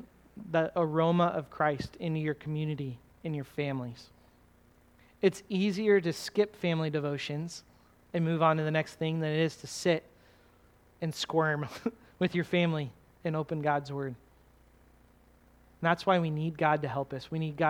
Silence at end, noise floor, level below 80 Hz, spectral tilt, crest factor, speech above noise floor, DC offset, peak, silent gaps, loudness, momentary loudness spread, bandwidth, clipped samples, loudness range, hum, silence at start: 0 s; -62 dBFS; -64 dBFS; -6.5 dB/octave; 22 dB; 32 dB; under 0.1%; -10 dBFS; none; -31 LUFS; 12 LU; 14.5 kHz; under 0.1%; 4 LU; none; 0 s